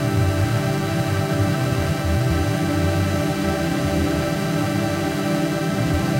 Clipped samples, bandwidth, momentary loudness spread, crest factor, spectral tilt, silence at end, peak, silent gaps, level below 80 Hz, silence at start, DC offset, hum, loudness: under 0.1%; 16 kHz; 2 LU; 12 dB; -6 dB/octave; 0 s; -8 dBFS; none; -36 dBFS; 0 s; under 0.1%; none; -21 LUFS